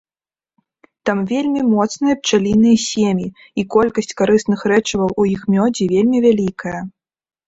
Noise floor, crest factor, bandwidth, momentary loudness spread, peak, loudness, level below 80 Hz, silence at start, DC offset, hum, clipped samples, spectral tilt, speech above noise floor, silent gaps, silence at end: under -90 dBFS; 14 dB; 8 kHz; 11 LU; -2 dBFS; -16 LUFS; -50 dBFS; 1.05 s; under 0.1%; none; under 0.1%; -5.5 dB/octave; over 74 dB; none; 0.6 s